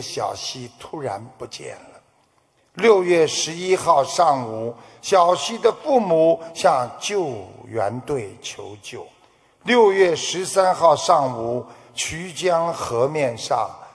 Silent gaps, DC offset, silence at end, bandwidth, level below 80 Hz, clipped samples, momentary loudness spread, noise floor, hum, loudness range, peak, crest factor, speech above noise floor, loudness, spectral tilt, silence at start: none; under 0.1%; 0.05 s; 11 kHz; -60 dBFS; under 0.1%; 18 LU; -62 dBFS; none; 4 LU; -2 dBFS; 20 dB; 42 dB; -20 LUFS; -3.5 dB/octave; 0 s